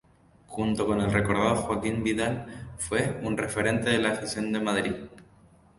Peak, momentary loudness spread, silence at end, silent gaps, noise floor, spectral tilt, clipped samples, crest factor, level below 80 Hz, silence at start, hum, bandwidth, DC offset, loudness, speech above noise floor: -8 dBFS; 11 LU; 0.55 s; none; -57 dBFS; -5 dB/octave; under 0.1%; 20 dB; -50 dBFS; 0.5 s; none; 11.5 kHz; under 0.1%; -27 LUFS; 30 dB